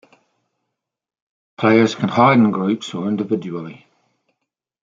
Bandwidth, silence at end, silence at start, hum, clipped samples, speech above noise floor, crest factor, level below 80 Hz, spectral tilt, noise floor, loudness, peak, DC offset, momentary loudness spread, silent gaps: 7.6 kHz; 1.1 s; 1.6 s; none; under 0.1%; 67 dB; 18 dB; -64 dBFS; -6.5 dB/octave; -84 dBFS; -17 LUFS; -2 dBFS; under 0.1%; 15 LU; none